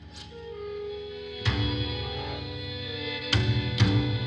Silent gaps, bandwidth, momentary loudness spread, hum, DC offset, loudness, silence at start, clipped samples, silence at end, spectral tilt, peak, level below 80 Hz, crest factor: none; 8.6 kHz; 14 LU; none; under 0.1%; -29 LUFS; 0 s; under 0.1%; 0 s; -6 dB/octave; -8 dBFS; -42 dBFS; 22 dB